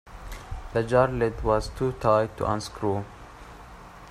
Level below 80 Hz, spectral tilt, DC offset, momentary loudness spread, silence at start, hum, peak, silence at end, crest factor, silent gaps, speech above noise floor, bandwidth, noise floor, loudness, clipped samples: -42 dBFS; -6.5 dB/octave; under 0.1%; 23 LU; 0.05 s; none; -6 dBFS; 0 s; 20 dB; none; 20 dB; 14.5 kHz; -45 dBFS; -26 LUFS; under 0.1%